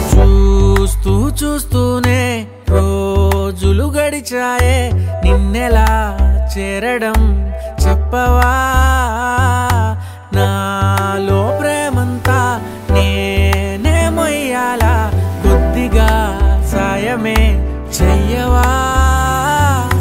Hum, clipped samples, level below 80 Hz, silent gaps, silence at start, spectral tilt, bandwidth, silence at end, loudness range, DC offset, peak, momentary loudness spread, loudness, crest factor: none; under 0.1%; -16 dBFS; none; 0 s; -5.5 dB/octave; 16.5 kHz; 0 s; 1 LU; under 0.1%; 0 dBFS; 5 LU; -14 LUFS; 12 dB